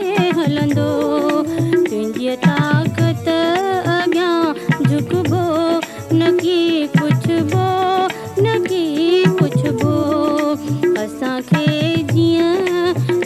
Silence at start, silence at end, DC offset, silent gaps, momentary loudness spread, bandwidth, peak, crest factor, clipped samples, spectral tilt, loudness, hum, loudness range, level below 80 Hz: 0 s; 0 s; under 0.1%; none; 4 LU; 13.5 kHz; -2 dBFS; 14 dB; under 0.1%; -6.5 dB/octave; -16 LUFS; none; 1 LU; -56 dBFS